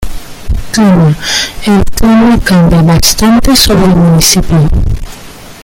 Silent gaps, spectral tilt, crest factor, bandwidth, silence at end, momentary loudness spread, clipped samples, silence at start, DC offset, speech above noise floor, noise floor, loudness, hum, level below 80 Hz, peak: none; -4.5 dB/octave; 6 dB; over 20 kHz; 0 s; 14 LU; 0.5%; 0 s; under 0.1%; 22 dB; -28 dBFS; -7 LUFS; none; -16 dBFS; 0 dBFS